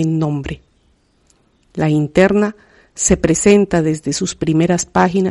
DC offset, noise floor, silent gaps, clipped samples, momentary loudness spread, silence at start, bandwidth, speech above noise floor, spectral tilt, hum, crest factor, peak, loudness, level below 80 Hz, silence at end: under 0.1%; -57 dBFS; none; under 0.1%; 10 LU; 0 s; 11.5 kHz; 43 dB; -5.5 dB/octave; none; 16 dB; 0 dBFS; -15 LUFS; -38 dBFS; 0 s